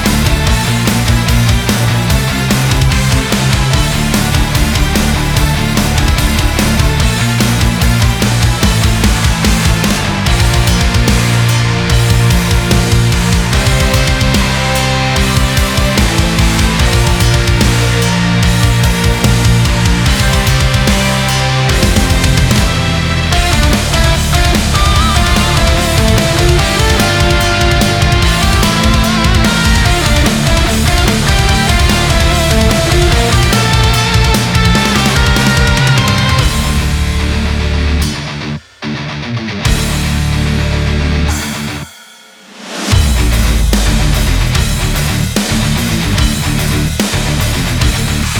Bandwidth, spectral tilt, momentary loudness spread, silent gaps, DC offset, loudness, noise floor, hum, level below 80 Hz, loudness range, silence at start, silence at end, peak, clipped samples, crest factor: over 20 kHz; -4.5 dB/octave; 4 LU; none; under 0.1%; -11 LUFS; -37 dBFS; none; -16 dBFS; 5 LU; 0 s; 0 s; 0 dBFS; under 0.1%; 10 dB